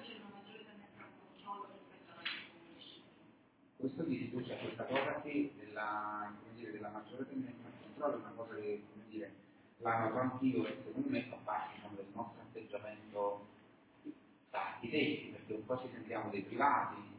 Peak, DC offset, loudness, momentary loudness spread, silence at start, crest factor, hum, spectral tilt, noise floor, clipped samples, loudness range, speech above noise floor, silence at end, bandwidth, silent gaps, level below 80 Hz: -20 dBFS; under 0.1%; -41 LUFS; 19 LU; 0 s; 22 dB; none; -4 dB/octave; -67 dBFS; under 0.1%; 6 LU; 27 dB; 0 s; 4 kHz; none; -80 dBFS